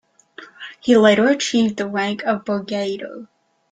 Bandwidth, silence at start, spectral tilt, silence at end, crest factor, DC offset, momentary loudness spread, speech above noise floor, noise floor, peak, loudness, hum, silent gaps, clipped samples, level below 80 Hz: 9.4 kHz; 0.4 s; -4.5 dB/octave; 0.45 s; 18 dB; under 0.1%; 21 LU; 26 dB; -43 dBFS; -2 dBFS; -18 LUFS; none; none; under 0.1%; -62 dBFS